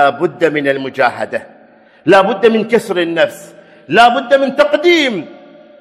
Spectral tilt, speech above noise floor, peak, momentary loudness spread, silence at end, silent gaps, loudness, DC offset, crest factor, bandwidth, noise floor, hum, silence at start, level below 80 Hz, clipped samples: -5 dB/octave; 32 dB; 0 dBFS; 10 LU; 0.45 s; none; -12 LUFS; under 0.1%; 14 dB; 14 kHz; -44 dBFS; none; 0 s; -56 dBFS; 0.4%